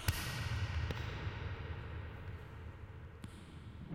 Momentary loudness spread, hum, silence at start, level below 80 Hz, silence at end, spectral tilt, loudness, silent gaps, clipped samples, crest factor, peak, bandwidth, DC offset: 13 LU; none; 0 s; -50 dBFS; 0 s; -4.5 dB/octave; -44 LUFS; none; under 0.1%; 28 dB; -14 dBFS; 16.5 kHz; under 0.1%